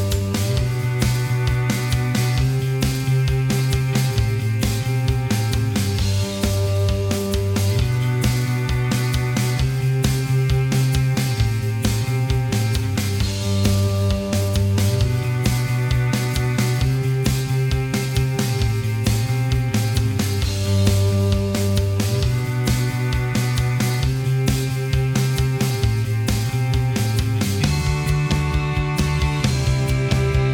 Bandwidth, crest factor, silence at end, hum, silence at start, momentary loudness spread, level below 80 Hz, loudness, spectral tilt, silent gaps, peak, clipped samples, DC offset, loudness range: 17.5 kHz; 18 dB; 0 s; none; 0 s; 2 LU; -30 dBFS; -20 LUFS; -5.5 dB/octave; none; -2 dBFS; under 0.1%; under 0.1%; 1 LU